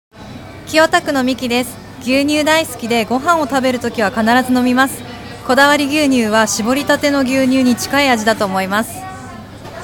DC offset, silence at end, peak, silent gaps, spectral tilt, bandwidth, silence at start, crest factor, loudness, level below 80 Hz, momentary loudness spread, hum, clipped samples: under 0.1%; 0 s; 0 dBFS; none; -3.5 dB/octave; 18 kHz; 0.15 s; 14 dB; -14 LUFS; -46 dBFS; 17 LU; none; under 0.1%